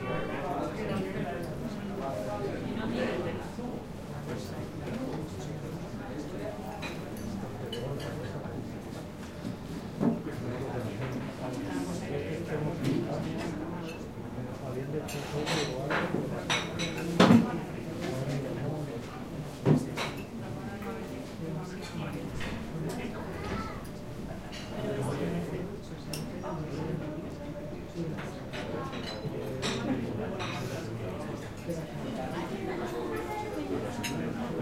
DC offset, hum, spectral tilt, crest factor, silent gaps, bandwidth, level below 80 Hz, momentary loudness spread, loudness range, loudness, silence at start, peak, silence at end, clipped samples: under 0.1%; none; -6 dB/octave; 26 dB; none; 16 kHz; -52 dBFS; 9 LU; 9 LU; -34 LUFS; 0 s; -8 dBFS; 0 s; under 0.1%